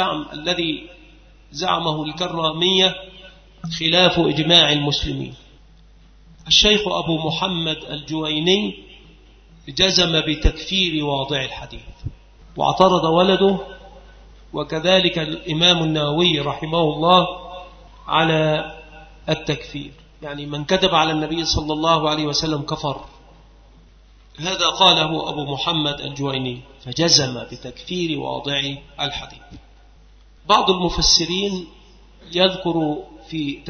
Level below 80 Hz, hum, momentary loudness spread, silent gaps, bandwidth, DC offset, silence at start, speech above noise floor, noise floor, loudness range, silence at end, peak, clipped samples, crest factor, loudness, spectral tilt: -38 dBFS; none; 19 LU; none; 6.6 kHz; under 0.1%; 0 s; 29 dB; -48 dBFS; 5 LU; 0 s; 0 dBFS; under 0.1%; 20 dB; -18 LUFS; -4 dB/octave